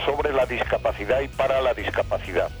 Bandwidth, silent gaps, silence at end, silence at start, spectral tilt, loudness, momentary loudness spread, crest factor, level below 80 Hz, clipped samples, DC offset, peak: over 20 kHz; none; 0 s; 0 s; -5.5 dB/octave; -24 LUFS; 4 LU; 14 dB; -38 dBFS; under 0.1%; under 0.1%; -10 dBFS